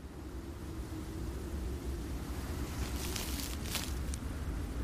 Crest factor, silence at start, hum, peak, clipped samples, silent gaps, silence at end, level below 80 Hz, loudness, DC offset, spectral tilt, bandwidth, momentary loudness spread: 22 dB; 0 s; none; -16 dBFS; under 0.1%; none; 0 s; -42 dBFS; -40 LUFS; under 0.1%; -4.5 dB/octave; 15.5 kHz; 7 LU